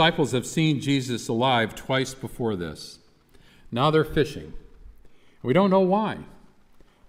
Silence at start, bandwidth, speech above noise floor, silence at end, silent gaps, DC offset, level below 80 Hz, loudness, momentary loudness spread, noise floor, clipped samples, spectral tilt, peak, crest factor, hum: 0 s; 16 kHz; 31 dB; 0.75 s; none; under 0.1%; -50 dBFS; -24 LUFS; 15 LU; -54 dBFS; under 0.1%; -5.5 dB/octave; -6 dBFS; 18 dB; none